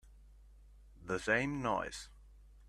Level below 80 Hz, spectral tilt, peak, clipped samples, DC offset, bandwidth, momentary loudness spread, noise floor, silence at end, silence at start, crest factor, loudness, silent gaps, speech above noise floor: -58 dBFS; -5 dB/octave; -16 dBFS; under 0.1%; under 0.1%; 13.5 kHz; 20 LU; -59 dBFS; 0 s; 0.05 s; 24 dB; -36 LUFS; none; 23 dB